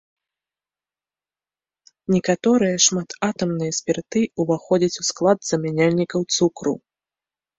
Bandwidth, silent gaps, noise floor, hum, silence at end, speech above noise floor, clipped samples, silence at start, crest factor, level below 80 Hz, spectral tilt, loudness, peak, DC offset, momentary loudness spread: 8 kHz; none; under -90 dBFS; none; 0.8 s; over 70 dB; under 0.1%; 2.1 s; 18 dB; -60 dBFS; -4 dB/octave; -20 LUFS; -4 dBFS; under 0.1%; 7 LU